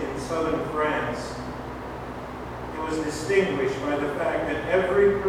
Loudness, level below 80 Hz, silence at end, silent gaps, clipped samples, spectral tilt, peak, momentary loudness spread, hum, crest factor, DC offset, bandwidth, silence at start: -26 LUFS; -44 dBFS; 0 s; none; under 0.1%; -5.5 dB/octave; -10 dBFS; 13 LU; none; 16 dB; under 0.1%; 14.5 kHz; 0 s